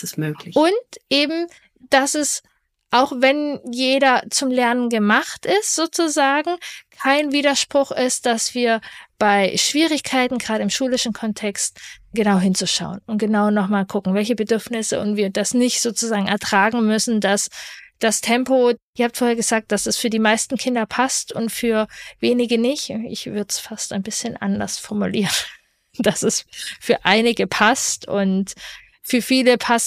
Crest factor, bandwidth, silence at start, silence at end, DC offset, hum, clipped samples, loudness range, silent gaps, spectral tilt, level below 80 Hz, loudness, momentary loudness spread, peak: 18 dB; 15.5 kHz; 0 s; 0 s; under 0.1%; none; under 0.1%; 4 LU; 18.83-18.93 s; -3 dB/octave; -58 dBFS; -19 LUFS; 9 LU; 0 dBFS